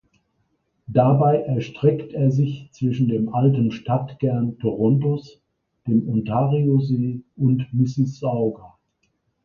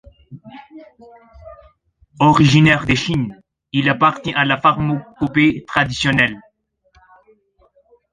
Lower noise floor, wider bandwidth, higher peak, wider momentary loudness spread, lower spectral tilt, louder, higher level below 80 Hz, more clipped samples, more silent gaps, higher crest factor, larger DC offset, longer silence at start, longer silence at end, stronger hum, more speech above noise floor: first, -70 dBFS vs -59 dBFS; second, 6.8 kHz vs 9.8 kHz; second, -4 dBFS vs 0 dBFS; second, 7 LU vs 11 LU; first, -10 dB/octave vs -5.5 dB/octave; second, -21 LUFS vs -16 LUFS; second, -56 dBFS vs -44 dBFS; neither; neither; about the same, 18 dB vs 18 dB; neither; first, 0.9 s vs 0.3 s; second, 0.75 s vs 1.7 s; neither; first, 50 dB vs 44 dB